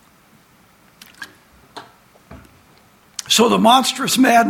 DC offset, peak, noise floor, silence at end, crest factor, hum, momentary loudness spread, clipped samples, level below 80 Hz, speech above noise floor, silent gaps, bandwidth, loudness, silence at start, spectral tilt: under 0.1%; 0 dBFS; -52 dBFS; 0 s; 18 dB; none; 27 LU; under 0.1%; -58 dBFS; 39 dB; none; 17 kHz; -14 LUFS; 1.2 s; -3 dB/octave